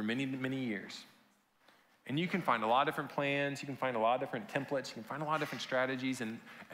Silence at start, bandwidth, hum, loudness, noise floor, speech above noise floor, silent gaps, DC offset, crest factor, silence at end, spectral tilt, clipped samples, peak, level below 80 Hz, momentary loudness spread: 0 s; 16 kHz; none; -35 LUFS; -70 dBFS; 34 dB; none; under 0.1%; 22 dB; 0 s; -5.5 dB/octave; under 0.1%; -16 dBFS; -84 dBFS; 11 LU